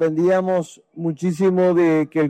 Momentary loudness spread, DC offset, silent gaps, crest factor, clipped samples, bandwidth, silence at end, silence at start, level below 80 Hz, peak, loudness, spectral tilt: 11 LU; under 0.1%; none; 10 dB; under 0.1%; 9.6 kHz; 0 s; 0 s; -64 dBFS; -8 dBFS; -19 LUFS; -8 dB/octave